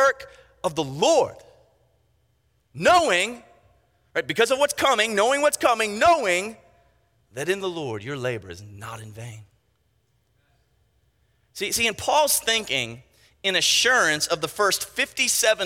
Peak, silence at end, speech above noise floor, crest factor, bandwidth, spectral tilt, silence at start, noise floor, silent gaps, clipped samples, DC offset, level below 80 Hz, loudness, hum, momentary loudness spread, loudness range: -4 dBFS; 0 s; 45 dB; 20 dB; 17 kHz; -2 dB/octave; 0 s; -68 dBFS; none; under 0.1%; under 0.1%; -60 dBFS; -21 LUFS; none; 19 LU; 12 LU